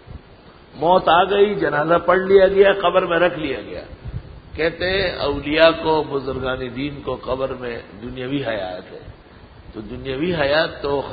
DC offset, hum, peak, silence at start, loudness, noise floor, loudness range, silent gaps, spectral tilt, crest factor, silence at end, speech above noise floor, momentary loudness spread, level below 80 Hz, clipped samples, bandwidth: under 0.1%; none; 0 dBFS; 0.1 s; -18 LUFS; -45 dBFS; 11 LU; none; -9 dB/octave; 20 dB; 0 s; 26 dB; 19 LU; -42 dBFS; under 0.1%; 5 kHz